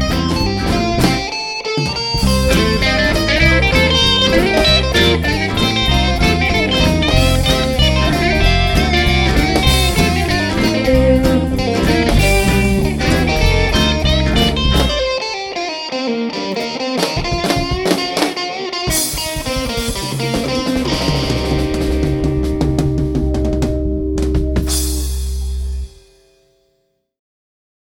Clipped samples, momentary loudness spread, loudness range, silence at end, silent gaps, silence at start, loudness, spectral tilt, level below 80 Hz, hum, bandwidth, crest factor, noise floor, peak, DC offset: under 0.1%; 8 LU; 6 LU; 2.05 s; none; 0 s; -15 LUFS; -4.5 dB/octave; -22 dBFS; none; 19.5 kHz; 14 dB; -64 dBFS; 0 dBFS; under 0.1%